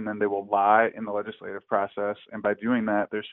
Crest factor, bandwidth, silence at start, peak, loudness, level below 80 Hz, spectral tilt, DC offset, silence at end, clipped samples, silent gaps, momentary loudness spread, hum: 20 dB; 4 kHz; 0 s; -6 dBFS; -26 LUFS; -70 dBFS; -4 dB/octave; under 0.1%; 0 s; under 0.1%; none; 11 LU; none